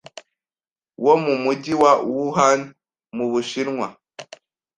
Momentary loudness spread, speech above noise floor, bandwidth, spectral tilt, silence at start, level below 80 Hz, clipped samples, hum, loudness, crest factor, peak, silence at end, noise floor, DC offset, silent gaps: 21 LU; over 71 dB; 10 kHz; -4.5 dB/octave; 0.15 s; -64 dBFS; under 0.1%; none; -20 LUFS; 20 dB; -2 dBFS; 0.55 s; under -90 dBFS; under 0.1%; none